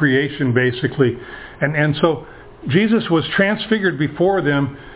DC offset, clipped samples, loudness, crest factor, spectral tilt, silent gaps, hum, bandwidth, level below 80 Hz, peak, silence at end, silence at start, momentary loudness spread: under 0.1%; under 0.1%; -18 LUFS; 16 dB; -10.5 dB/octave; none; none; 4 kHz; -48 dBFS; -2 dBFS; 0 s; 0 s; 6 LU